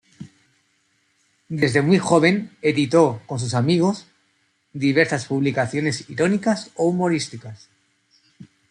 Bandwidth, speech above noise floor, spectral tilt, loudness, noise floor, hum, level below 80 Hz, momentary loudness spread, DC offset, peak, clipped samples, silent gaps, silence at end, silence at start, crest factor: 11 kHz; 46 dB; -6 dB/octave; -20 LUFS; -66 dBFS; none; -62 dBFS; 11 LU; under 0.1%; -2 dBFS; under 0.1%; none; 0.25 s; 0.2 s; 20 dB